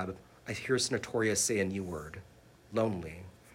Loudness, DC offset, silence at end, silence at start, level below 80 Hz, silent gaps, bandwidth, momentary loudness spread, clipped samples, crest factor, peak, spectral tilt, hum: -33 LUFS; under 0.1%; 0 s; 0 s; -60 dBFS; none; 16 kHz; 18 LU; under 0.1%; 18 dB; -16 dBFS; -3.5 dB/octave; none